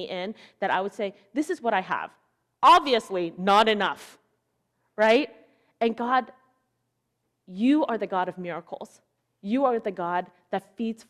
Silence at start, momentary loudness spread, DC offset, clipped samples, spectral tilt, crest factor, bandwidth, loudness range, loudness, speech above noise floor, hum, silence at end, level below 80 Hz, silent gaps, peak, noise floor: 0 s; 18 LU; under 0.1%; under 0.1%; -5 dB/octave; 18 dB; 14.5 kHz; 6 LU; -25 LUFS; 52 dB; none; 0.15 s; -70 dBFS; none; -8 dBFS; -77 dBFS